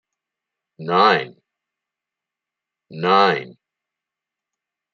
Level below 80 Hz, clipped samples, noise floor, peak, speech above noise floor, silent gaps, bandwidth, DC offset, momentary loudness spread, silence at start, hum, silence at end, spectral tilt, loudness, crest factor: -74 dBFS; under 0.1%; -86 dBFS; -2 dBFS; 69 dB; none; 7.2 kHz; under 0.1%; 16 LU; 0.8 s; none; 1.45 s; -6 dB/octave; -17 LUFS; 22 dB